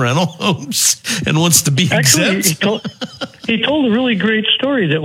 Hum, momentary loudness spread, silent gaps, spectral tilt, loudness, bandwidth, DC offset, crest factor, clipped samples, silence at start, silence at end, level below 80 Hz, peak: none; 9 LU; none; -3.5 dB/octave; -13 LUFS; over 20 kHz; under 0.1%; 14 dB; under 0.1%; 0 s; 0 s; -54 dBFS; 0 dBFS